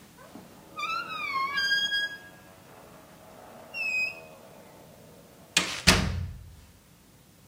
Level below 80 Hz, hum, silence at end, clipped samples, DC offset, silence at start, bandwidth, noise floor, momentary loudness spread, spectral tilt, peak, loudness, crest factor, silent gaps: -46 dBFS; none; 0.8 s; under 0.1%; under 0.1%; 0 s; 16 kHz; -56 dBFS; 27 LU; -2.5 dB/octave; 0 dBFS; -27 LUFS; 32 dB; none